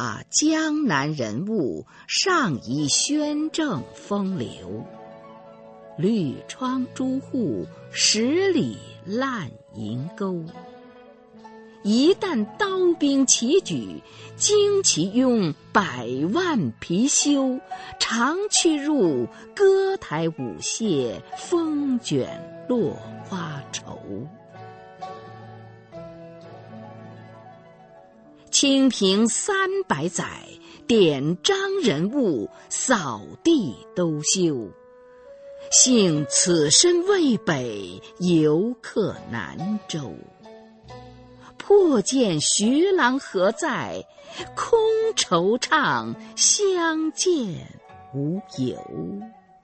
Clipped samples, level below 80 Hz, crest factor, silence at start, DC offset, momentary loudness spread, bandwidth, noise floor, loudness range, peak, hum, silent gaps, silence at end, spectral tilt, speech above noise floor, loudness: under 0.1%; -62 dBFS; 22 dB; 0 s; under 0.1%; 19 LU; 8.8 kHz; -50 dBFS; 9 LU; -2 dBFS; none; none; 0.35 s; -3.5 dB/octave; 28 dB; -22 LUFS